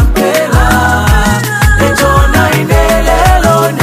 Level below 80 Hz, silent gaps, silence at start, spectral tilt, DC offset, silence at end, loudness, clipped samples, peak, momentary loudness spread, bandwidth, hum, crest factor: -12 dBFS; none; 0 s; -5 dB/octave; under 0.1%; 0 s; -9 LUFS; 0.7%; 0 dBFS; 2 LU; 16 kHz; none; 8 dB